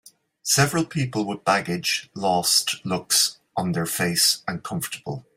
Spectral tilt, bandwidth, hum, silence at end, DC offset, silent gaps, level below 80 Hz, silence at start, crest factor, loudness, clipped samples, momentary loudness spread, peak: -2.5 dB/octave; 16 kHz; none; 0.15 s; under 0.1%; none; -60 dBFS; 0.45 s; 20 dB; -22 LUFS; under 0.1%; 11 LU; -4 dBFS